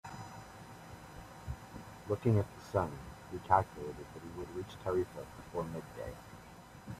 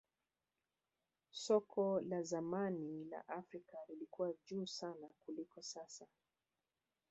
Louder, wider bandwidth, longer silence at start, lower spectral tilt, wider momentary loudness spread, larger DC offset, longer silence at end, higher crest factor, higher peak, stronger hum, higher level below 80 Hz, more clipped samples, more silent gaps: first, -38 LUFS vs -44 LUFS; first, 15 kHz vs 8 kHz; second, 0.05 s vs 1.35 s; first, -7.5 dB/octave vs -5.5 dB/octave; first, 20 LU vs 16 LU; neither; second, 0 s vs 1.05 s; about the same, 26 dB vs 22 dB; first, -12 dBFS vs -24 dBFS; neither; first, -58 dBFS vs -88 dBFS; neither; neither